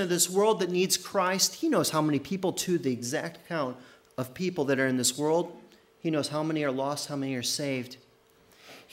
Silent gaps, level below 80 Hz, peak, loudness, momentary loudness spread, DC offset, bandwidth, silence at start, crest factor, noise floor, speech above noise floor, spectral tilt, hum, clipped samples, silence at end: none; -72 dBFS; -10 dBFS; -28 LUFS; 11 LU; under 0.1%; 16 kHz; 0 s; 18 dB; -61 dBFS; 33 dB; -3.5 dB/octave; none; under 0.1%; 0.1 s